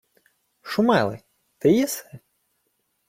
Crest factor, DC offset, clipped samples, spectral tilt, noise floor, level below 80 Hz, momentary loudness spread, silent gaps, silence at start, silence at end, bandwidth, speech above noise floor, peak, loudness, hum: 18 dB; under 0.1%; under 0.1%; -5 dB/octave; -72 dBFS; -62 dBFS; 17 LU; none; 0.65 s; 0.9 s; 16.5 kHz; 52 dB; -6 dBFS; -22 LUFS; none